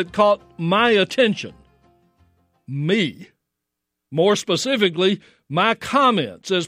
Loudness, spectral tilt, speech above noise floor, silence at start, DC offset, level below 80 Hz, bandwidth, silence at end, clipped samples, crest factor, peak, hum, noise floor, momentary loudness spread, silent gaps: -19 LUFS; -4.5 dB/octave; 62 dB; 0 s; under 0.1%; -62 dBFS; 15.5 kHz; 0 s; under 0.1%; 18 dB; -2 dBFS; none; -81 dBFS; 11 LU; none